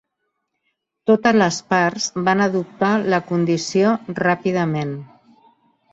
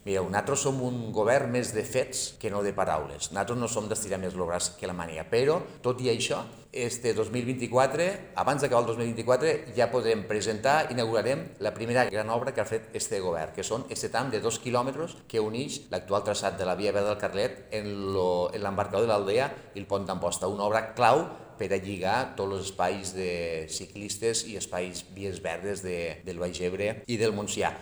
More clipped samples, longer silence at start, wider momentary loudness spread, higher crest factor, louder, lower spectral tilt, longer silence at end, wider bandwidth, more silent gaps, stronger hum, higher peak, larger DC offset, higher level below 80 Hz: neither; first, 1.05 s vs 0.05 s; about the same, 6 LU vs 8 LU; about the same, 18 dB vs 22 dB; first, -19 LUFS vs -29 LUFS; first, -5.5 dB/octave vs -4 dB/octave; first, 0.9 s vs 0 s; second, 8 kHz vs over 20 kHz; neither; neither; first, -2 dBFS vs -8 dBFS; neither; about the same, -62 dBFS vs -58 dBFS